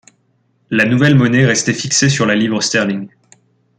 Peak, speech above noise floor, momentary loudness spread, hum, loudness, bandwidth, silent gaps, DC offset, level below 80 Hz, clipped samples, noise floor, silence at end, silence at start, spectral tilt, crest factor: 0 dBFS; 47 dB; 9 LU; none; -13 LUFS; 9.6 kHz; none; under 0.1%; -52 dBFS; under 0.1%; -60 dBFS; 0.7 s; 0.7 s; -4.5 dB/octave; 14 dB